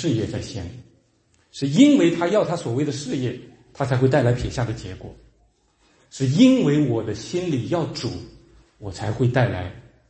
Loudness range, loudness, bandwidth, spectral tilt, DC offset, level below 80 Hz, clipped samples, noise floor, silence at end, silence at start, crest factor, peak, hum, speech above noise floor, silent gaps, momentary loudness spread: 5 LU; -21 LUFS; 8.8 kHz; -6.5 dB/octave; under 0.1%; -48 dBFS; under 0.1%; -62 dBFS; 0.3 s; 0 s; 18 dB; -2 dBFS; none; 42 dB; none; 21 LU